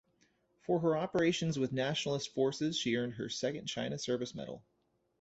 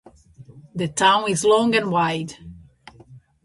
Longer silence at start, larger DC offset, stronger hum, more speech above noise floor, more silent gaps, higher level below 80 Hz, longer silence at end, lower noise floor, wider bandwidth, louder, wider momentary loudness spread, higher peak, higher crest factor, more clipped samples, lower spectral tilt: first, 0.7 s vs 0.4 s; neither; neither; first, 39 dB vs 28 dB; neither; second, -70 dBFS vs -56 dBFS; first, 0.6 s vs 0.25 s; first, -73 dBFS vs -48 dBFS; second, 8.2 kHz vs 11.5 kHz; second, -34 LUFS vs -19 LUFS; second, 10 LU vs 18 LU; second, -18 dBFS vs -2 dBFS; about the same, 18 dB vs 20 dB; neither; about the same, -5 dB/octave vs -4 dB/octave